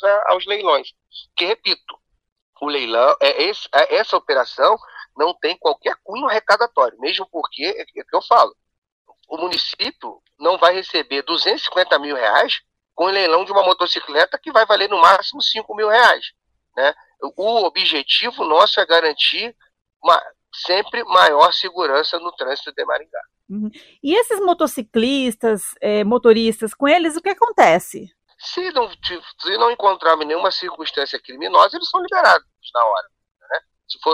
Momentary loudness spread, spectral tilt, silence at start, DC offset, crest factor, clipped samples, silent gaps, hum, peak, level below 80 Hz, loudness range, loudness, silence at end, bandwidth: 13 LU; -3 dB/octave; 0 s; under 0.1%; 18 dB; under 0.1%; 2.32-2.36 s, 2.42-2.53 s, 8.78-8.82 s, 8.92-9.05 s, 19.96-20.00 s; none; 0 dBFS; -64 dBFS; 4 LU; -17 LUFS; 0 s; 15 kHz